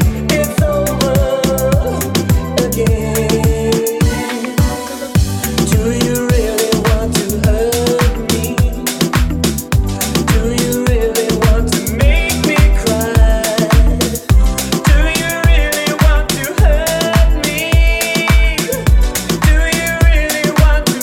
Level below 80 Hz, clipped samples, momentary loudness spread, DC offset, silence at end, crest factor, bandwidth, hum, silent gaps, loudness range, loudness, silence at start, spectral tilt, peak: -16 dBFS; under 0.1%; 4 LU; under 0.1%; 0 s; 12 dB; 18 kHz; none; none; 2 LU; -14 LUFS; 0 s; -5 dB/octave; 0 dBFS